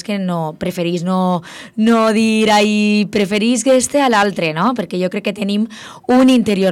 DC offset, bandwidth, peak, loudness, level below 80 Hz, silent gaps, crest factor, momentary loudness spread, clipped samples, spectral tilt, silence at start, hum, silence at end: under 0.1%; 15 kHz; -4 dBFS; -15 LUFS; -54 dBFS; none; 12 dB; 9 LU; under 0.1%; -5 dB/octave; 0.1 s; none; 0 s